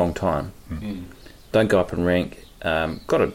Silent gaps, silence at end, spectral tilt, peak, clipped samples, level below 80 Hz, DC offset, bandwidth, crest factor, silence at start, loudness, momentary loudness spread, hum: none; 0 s; -6.5 dB/octave; -6 dBFS; under 0.1%; -42 dBFS; under 0.1%; 16.5 kHz; 16 dB; 0 s; -24 LUFS; 14 LU; none